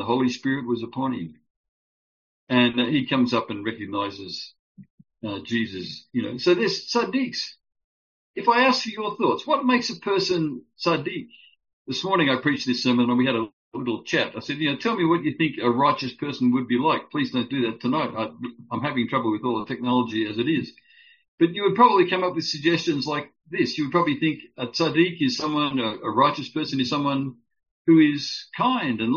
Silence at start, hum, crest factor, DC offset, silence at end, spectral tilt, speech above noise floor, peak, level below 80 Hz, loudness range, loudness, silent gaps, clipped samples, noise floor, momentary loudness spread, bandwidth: 0 s; none; 20 dB; under 0.1%; 0 s; -3.5 dB/octave; over 67 dB; -4 dBFS; -68 dBFS; 4 LU; -23 LUFS; 1.50-2.47 s, 4.59-4.75 s, 4.90-4.98 s, 7.84-8.34 s, 11.73-11.85 s, 13.53-13.72 s, 21.28-21.38 s, 27.71-27.85 s; under 0.1%; under -90 dBFS; 10 LU; 7.2 kHz